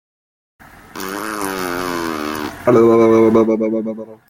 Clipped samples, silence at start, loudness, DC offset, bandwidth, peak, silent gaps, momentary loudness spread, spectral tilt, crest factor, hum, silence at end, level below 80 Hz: under 0.1%; 0.95 s; -16 LUFS; under 0.1%; 16.5 kHz; -2 dBFS; none; 15 LU; -6 dB/octave; 16 dB; none; 0.15 s; -50 dBFS